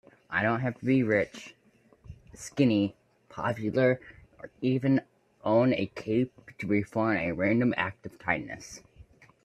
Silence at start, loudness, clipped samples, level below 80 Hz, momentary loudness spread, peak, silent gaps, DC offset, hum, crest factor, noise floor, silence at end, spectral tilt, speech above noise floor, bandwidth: 0.3 s; -28 LUFS; under 0.1%; -62 dBFS; 17 LU; -10 dBFS; none; under 0.1%; none; 20 dB; -59 dBFS; 0.4 s; -7 dB/octave; 31 dB; 11.5 kHz